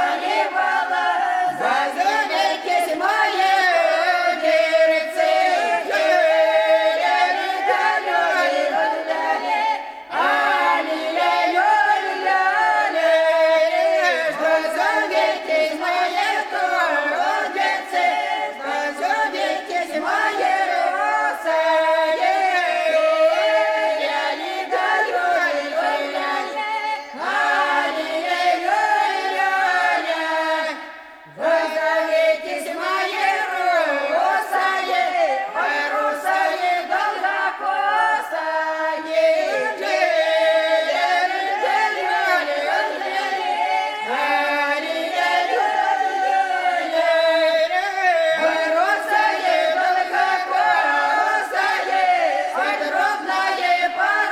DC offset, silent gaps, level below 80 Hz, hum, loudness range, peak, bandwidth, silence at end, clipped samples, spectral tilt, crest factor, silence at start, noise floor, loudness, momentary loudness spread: under 0.1%; none; -68 dBFS; none; 3 LU; -4 dBFS; 15.5 kHz; 0 s; under 0.1%; -1 dB/octave; 14 dB; 0 s; -40 dBFS; -19 LUFS; 5 LU